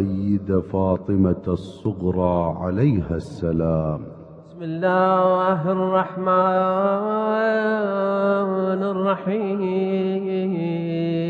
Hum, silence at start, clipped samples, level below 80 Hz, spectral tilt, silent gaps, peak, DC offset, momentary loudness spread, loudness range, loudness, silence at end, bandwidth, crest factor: none; 0 s; under 0.1%; -46 dBFS; -9.5 dB/octave; none; -6 dBFS; under 0.1%; 7 LU; 3 LU; -21 LUFS; 0 s; 5.8 kHz; 16 dB